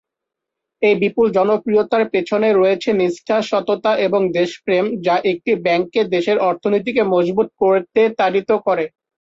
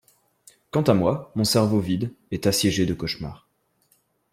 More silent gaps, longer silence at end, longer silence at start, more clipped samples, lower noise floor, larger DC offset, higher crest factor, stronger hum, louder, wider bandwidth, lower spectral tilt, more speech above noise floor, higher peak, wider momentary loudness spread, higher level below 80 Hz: neither; second, 0.3 s vs 0.95 s; about the same, 0.8 s vs 0.75 s; neither; first, -82 dBFS vs -66 dBFS; neither; second, 12 dB vs 20 dB; neither; first, -17 LUFS vs -23 LUFS; second, 7.8 kHz vs 16.5 kHz; about the same, -6 dB/octave vs -5 dB/octave; first, 66 dB vs 44 dB; about the same, -4 dBFS vs -4 dBFS; second, 3 LU vs 10 LU; second, -60 dBFS vs -52 dBFS